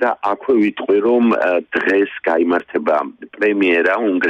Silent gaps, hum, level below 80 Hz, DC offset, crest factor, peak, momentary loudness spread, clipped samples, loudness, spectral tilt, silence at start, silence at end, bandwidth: none; none; -62 dBFS; under 0.1%; 12 dB; -4 dBFS; 5 LU; under 0.1%; -16 LUFS; -6.5 dB/octave; 0 s; 0 s; 7.6 kHz